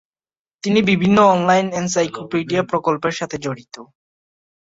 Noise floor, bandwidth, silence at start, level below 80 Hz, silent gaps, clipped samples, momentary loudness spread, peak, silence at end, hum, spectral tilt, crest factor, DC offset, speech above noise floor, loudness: under -90 dBFS; 7.8 kHz; 0.65 s; -56 dBFS; none; under 0.1%; 14 LU; -2 dBFS; 0.85 s; none; -5 dB/octave; 18 dB; under 0.1%; over 72 dB; -18 LUFS